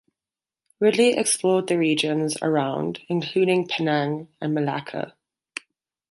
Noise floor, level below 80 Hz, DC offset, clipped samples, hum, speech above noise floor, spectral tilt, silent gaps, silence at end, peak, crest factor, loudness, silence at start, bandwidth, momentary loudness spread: under -90 dBFS; -70 dBFS; under 0.1%; under 0.1%; none; over 68 dB; -4.5 dB/octave; none; 1 s; -6 dBFS; 16 dB; -23 LUFS; 0.8 s; 11.5 kHz; 15 LU